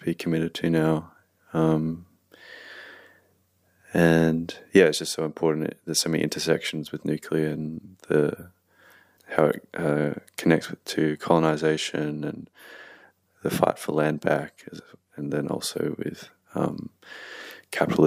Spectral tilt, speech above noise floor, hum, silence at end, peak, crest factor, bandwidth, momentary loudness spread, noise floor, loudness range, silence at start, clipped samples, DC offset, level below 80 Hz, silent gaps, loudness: -5.5 dB/octave; 41 dB; none; 0 s; -4 dBFS; 22 dB; 15.5 kHz; 20 LU; -66 dBFS; 5 LU; 0 s; under 0.1%; under 0.1%; -60 dBFS; none; -25 LUFS